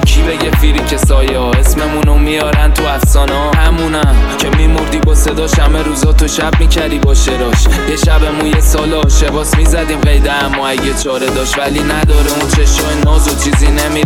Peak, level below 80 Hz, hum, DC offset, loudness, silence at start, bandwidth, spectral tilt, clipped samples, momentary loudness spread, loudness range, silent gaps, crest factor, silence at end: 0 dBFS; -12 dBFS; none; under 0.1%; -11 LUFS; 0 s; 16.5 kHz; -4.5 dB/octave; under 0.1%; 2 LU; 1 LU; none; 8 dB; 0 s